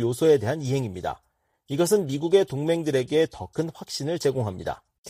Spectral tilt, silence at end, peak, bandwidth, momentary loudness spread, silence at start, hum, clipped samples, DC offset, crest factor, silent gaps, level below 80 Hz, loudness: -5.5 dB/octave; 0 s; -6 dBFS; 15.5 kHz; 12 LU; 0 s; none; under 0.1%; under 0.1%; 18 dB; 4.98-5.03 s; -58 dBFS; -25 LUFS